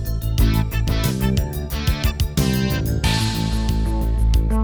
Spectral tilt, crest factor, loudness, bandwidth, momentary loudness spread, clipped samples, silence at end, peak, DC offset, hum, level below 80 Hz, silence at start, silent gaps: -5.5 dB/octave; 14 dB; -21 LUFS; over 20 kHz; 4 LU; under 0.1%; 0 s; -4 dBFS; under 0.1%; none; -22 dBFS; 0 s; none